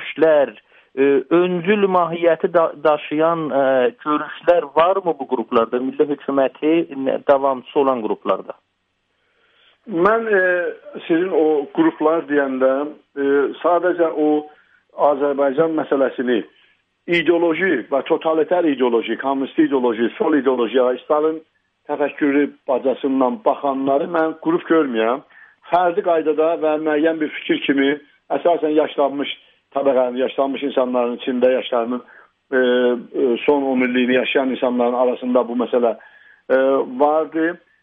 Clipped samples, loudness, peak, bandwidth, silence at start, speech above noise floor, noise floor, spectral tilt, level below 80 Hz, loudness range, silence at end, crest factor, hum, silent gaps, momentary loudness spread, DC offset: under 0.1%; -18 LUFS; -2 dBFS; 4.1 kHz; 0 s; 52 dB; -69 dBFS; -8 dB/octave; -66 dBFS; 2 LU; 0.25 s; 16 dB; none; none; 6 LU; under 0.1%